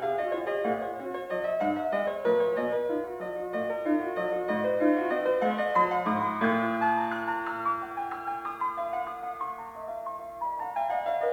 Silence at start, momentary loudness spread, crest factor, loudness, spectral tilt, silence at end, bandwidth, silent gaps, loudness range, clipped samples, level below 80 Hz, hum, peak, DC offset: 0 s; 10 LU; 18 dB; -29 LUFS; -6.5 dB/octave; 0 s; 17.5 kHz; none; 6 LU; under 0.1%; -66 dBFS; none; -12 dBFS; under 0.1%